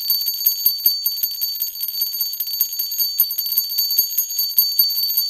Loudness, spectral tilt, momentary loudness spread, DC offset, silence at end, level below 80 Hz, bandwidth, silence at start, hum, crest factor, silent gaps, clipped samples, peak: -17 LUFS; 4.5 dB/octave; 6 LU; under 0.1%; 0 s; -62 dBFS; 17 kHz; 0 s; none; 20 dB; none; under 0.1%; 0 dBFS